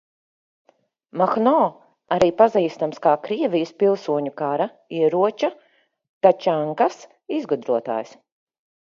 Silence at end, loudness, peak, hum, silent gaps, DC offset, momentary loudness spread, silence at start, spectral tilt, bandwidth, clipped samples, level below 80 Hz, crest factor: 0.85 s; -21 LUFS; 0 dBFS; none; 6.09-6.21 s; under 0.1%; 10 LU; 1.15 s; -6.5 dB/octave; 7.6 kHz; under 0.1%; -64 dBFS; 20 dB